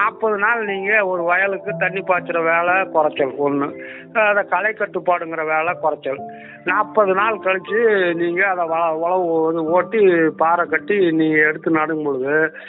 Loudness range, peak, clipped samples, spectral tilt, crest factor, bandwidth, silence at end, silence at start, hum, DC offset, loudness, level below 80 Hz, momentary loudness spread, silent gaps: 3 LU; -2 dBFS; under 0.1%; -3.5 dB/octave; 16 dB; 4.1 kHz; 0 s; 0 s; none; under 0.1%; -18 LUFS; -70 dBFS; 6 LU; none